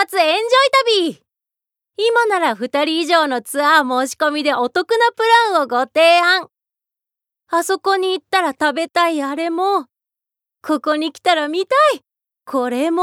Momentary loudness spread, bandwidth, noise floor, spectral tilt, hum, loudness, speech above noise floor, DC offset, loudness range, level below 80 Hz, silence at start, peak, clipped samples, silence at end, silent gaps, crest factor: 8 LU; 17 kHz; -84 dBFS; -1.5 dB/octave; none; -16 LUFS; 68 dB; under 0.1%; 4 LU; -74 dBFS; 0 s; -2 dBFS; under 0.1%; 0 s; none; 16 dB